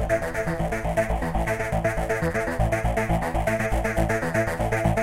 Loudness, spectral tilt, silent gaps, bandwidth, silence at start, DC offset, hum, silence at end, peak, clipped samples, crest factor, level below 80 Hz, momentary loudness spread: -25 LUFS; -6.5 dB/octave; none; 16.5 kHz; 0 s; under 0.1%; none; 0 s; -8 dBFS; under 0.1%; 16 dB; -32 dBFS; 2 LU